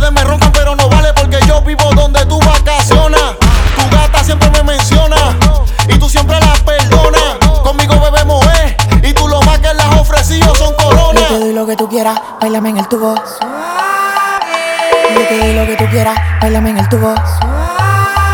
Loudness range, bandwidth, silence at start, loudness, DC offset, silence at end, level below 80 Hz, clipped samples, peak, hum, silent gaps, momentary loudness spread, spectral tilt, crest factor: 3 LU; 18.5 kHz; 0 s; -10 LUFS; under 0.1%; 0 s; -12 dBFS; 0.6%; 0 dBFS; none; none; 5 LU; -5 dB/octave; 8 dB